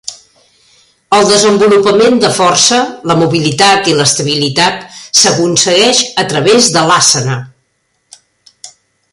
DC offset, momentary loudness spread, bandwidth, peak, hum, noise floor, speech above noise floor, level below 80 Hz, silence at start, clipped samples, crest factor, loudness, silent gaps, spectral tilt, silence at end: under 0.1%; 6 LU; 16 kHz; 0 dBFS; none; -61 dBFS; 52 dB; -50 dBFS; 0.05 s; under 0.1%; 10 dB; -8 LUFS; none; -3 dB/octave; 0.45 s